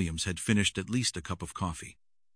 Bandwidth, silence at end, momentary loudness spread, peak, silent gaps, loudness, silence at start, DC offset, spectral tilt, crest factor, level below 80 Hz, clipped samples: 10.5 kHz; 0.4 s; 12 LU; -14 dBFS; none; -31 LUFS; 0 s; under 0.1%; -4 dB/octave; 20 dB; -50 dBFS; under 0.1%